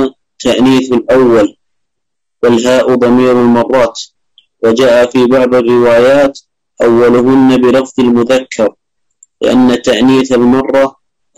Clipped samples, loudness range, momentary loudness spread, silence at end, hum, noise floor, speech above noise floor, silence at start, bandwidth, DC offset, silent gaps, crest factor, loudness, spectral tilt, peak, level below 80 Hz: under 0.1%; 2 LU; 8 LU; 0.5 s; none; -78 dBFS; 70 dB; 0 s; 12 kHz; under 0.1%; none; 8 dB; -9 LUFS; -5.5 dB/octave; -2 dBFS; -42 dBFS